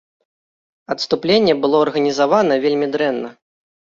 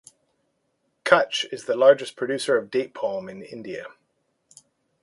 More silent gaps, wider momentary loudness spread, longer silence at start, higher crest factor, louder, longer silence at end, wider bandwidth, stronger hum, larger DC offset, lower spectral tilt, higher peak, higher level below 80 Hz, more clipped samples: neither; second, 11 LU vs 19 LU; second, 0.9 s vs 1.05 s; second, 16 dB vs 24 dB; first, -17 LUFS vs -22 LUFS; second, 0.65 s vs 1.15 s; second, 7.6 kHz vs 11.5 kHz; neither; neither; first, -5 dB/octave vs -3.5 dB/octave; about the same, -2 dBFS vs 0 dBFS; first, -60 dBFS vs -70 dBFS; neither